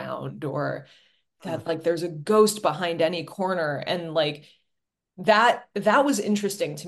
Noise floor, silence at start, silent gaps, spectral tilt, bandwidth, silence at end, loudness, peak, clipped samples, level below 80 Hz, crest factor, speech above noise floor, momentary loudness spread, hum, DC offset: -81 dBFS; 0 s; none; -4.5 dB/octave; 12.5 kHz; 0 s; -24 LUFS; -4 dBFS; under 0.1%; -72 dBFS; 20 dB; 57 dB; 13 LU; none; under 0.1%